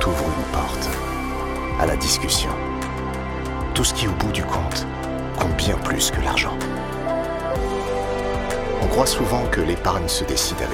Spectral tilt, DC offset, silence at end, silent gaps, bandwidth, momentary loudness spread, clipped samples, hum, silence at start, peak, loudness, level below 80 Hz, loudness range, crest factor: -4 dB/octave; under 0.1%; 0 s; none; 17.5 kHz; 8 LU; under 0.1%; none; 0 s; -4 dBFS; -22 LUFS; -30 dBFS; 1 LU; 18 dB